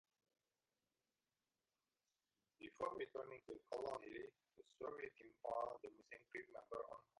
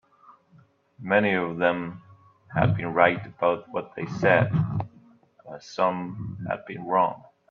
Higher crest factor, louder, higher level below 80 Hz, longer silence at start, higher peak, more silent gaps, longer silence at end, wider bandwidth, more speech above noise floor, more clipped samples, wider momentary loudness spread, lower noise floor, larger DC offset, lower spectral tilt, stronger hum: about the same, 22 dB vs 22 dB; second, -52 LUFS vs -25 LUFS; second, -84 dBFS vs -58 dBFS; first, 2.6 s vs 0.3 s; second, -32 dBFS vs -4 dBFS; neither; about the same, 0.2 s vs 0.3 s; first, 11 kHz vs 7.2 kHz; first, over 38 dB vs 34 dB; neither; second, 11 LU vs 16 LU; first, under -90 dBFS vs -58 dBFS; neither; second, -5 dB/octave vs -7.5 dB/octave; neither